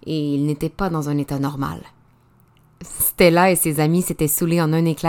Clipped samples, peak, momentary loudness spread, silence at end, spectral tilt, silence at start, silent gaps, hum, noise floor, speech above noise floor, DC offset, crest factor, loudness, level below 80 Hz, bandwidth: under 0.1%; 0 dBFS; 11 LU; 0 s; -5 dB/octave; 0.05 s; none; none; -55 dBFS; 36 dB; under 0.1%; 20 dB; -19 LUFS; -44 dBFS; 18 kHz